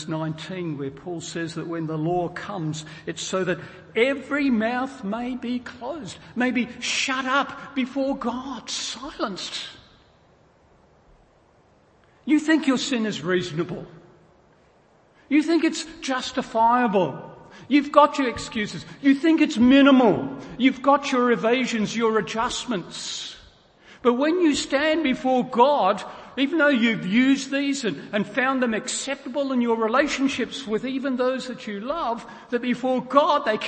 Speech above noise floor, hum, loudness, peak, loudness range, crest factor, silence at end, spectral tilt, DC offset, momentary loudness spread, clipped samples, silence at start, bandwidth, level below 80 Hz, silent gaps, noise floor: 35 dB; none; -23 LUFS; 0 dBFS; 9 LU; 22 dB; 0 s; -4.5 dB/octave; under 0.1%; 12 LU; under 0.1%; 0 s; 8.8 kHz; -58 dBFS; none; -58 dBFS